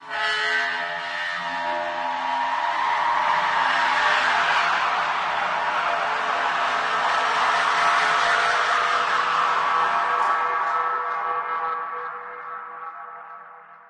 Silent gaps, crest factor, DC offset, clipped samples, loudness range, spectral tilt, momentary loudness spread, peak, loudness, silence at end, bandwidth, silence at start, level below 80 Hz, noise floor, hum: none; 16 dB; under 0.1%; under 0.1%; 4 LU; -1 dB/octave; 13 LU; -8 dBFS; -22 LUFS; 0.1 s; 11 kHz; 0 s; -66 dBFS; -45 dBFS; none